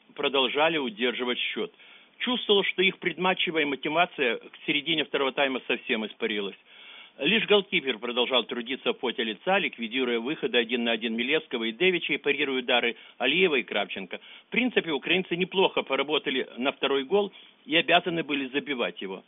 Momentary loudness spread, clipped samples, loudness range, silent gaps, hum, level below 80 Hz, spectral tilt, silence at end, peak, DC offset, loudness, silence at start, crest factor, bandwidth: 7 LU; under 0.1%; 2 LU; none; none; -74 dBFS; -1 dB/octave; 0.05 s; -8 dBFS; under 0.1%; -26 LUFS; 0.15 s; 20 dB; 4 kHz